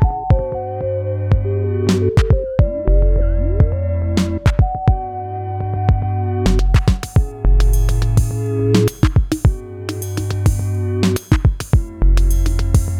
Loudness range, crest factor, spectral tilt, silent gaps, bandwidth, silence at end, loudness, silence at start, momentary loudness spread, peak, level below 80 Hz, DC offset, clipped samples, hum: 2 LU; 14 dB; -7 dB/octave; none; 15 kHz; 0 s; -18 LUFS; 0 s; 7 LU; 0 dBFS; -18 dBFS; under 0.1%; under 0.1%; none